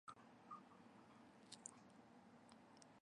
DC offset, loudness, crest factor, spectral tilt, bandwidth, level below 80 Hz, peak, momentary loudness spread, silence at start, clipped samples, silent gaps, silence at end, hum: under 0.1%; -63 LUFS; 32 dB; -3 dB/octave; 11 kHz; under -90 dBFS; -32 dBFS; 8 LU; 0.05 s; under 0.1%; none; 0 s; none